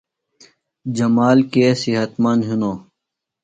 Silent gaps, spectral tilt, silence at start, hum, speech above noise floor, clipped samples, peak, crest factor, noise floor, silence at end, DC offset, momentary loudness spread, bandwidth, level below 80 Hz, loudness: none; -6.5 dB/octave; 0.85 s; none; 65 dB; under 0.1%; -2 dBFS; 16 dB; -81 dBFS; 0.6 s; under 0.1%; 12 LU; 9 kHz; -60 dBFS; -17 LUFS